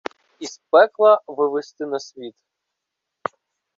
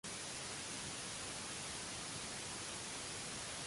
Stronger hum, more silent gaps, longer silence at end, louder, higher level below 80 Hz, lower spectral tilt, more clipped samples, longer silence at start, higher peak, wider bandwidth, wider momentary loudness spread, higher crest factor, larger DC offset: neither; neither; first, 1.45 s vs 0 s; first, -18 LUFS vs -44 LUFS; second, -76 dBFS vs -66 dBFS; first, -3.5 dB/octave vs -1.5 dB/octave; neither; first, 0.4 s vs 0.05 s; first, -2 dBFS vs -32 dBFS; second, 7.6 kHz vs 11.5 kHz; first, 21 LU vs 0 LU; first, 20 dB vs 14 dB; neither